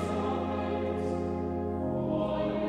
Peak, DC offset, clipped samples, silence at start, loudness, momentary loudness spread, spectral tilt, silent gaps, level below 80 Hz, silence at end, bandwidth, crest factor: -18 dBFS; under 0.1%; under 0.1%; 0 s; -32 LUFS; 2 LU; -8 dB/octave; none; -50 dBFS; 0 s; 11 kHz; 12 dB